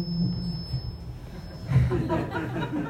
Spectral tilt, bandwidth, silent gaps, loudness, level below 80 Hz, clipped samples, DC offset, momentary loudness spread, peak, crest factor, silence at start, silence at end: -8 dB/octave; 9.6 kHz; none; -28 LUFS; -40 dBFS; under 0.1%; under 0.1%; 16 LU; -10 dBFS; 18 dB; 0 s; 0 s